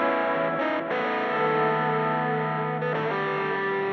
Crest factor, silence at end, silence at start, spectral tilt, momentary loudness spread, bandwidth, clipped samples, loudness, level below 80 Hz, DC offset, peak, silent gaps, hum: 14 dB; 0 s; 0 s; -8 dB/octave; 3 LU; 6.4 kHz; under 0.1%; -25 LUFS; -78 dBFS; under 0.1%; -12 dBFS; none; none